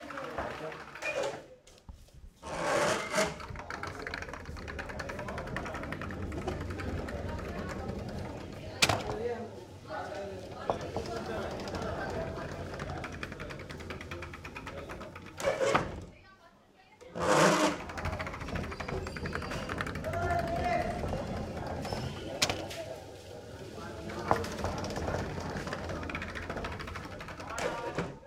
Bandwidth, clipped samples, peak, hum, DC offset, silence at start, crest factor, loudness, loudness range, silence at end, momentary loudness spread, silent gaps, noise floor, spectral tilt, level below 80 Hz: 17 kHz; under 0.1%; -6 dBFS; none; under 0.1%; 0 s; 30 dB; -35 LUFS; 7 LU; 0 s; 13 LU; none; -60 dBFS; -4 dB/octave; -50 dBFS